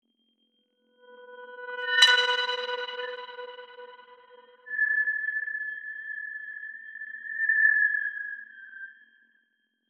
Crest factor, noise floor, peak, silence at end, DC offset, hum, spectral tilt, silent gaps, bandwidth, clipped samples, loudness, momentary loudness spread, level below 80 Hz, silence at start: 26 dB; -74 dBFS; -4 dBFS; 0.95 s; under 0.1%; none; 4 dB/octave; none; 10 kHz; under 0.1%; -25 LUFS; 24 LU; under -90 dBFS; 1.1 s